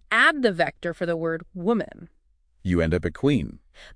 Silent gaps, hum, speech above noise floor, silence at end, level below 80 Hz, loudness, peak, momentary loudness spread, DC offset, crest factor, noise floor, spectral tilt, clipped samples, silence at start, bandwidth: none; none; 37 dB; 0 s; -44 dBFS; -24 LUFS; -6 dBFS; 11 LU; under 0.1%; 20 dB; -62 dBFS; -6 dB/octave; under 0.1%; 0.1 s; 10.5 kHz